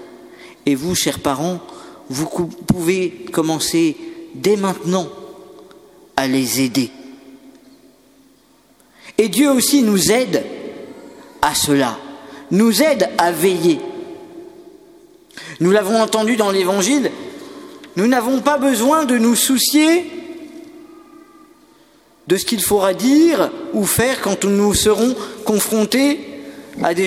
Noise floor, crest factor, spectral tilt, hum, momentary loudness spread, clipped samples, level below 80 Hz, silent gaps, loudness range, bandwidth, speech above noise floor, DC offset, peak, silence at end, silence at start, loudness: -52 dBFS; 18 dB; -4 dB/octave; none; 21 LU; under 0.1%; -48 dBFS; none; 5 LU; 17 kHz; 37 dB; under 0.1%; 0 dBFS; 0 s; 0 s; -16 LUFS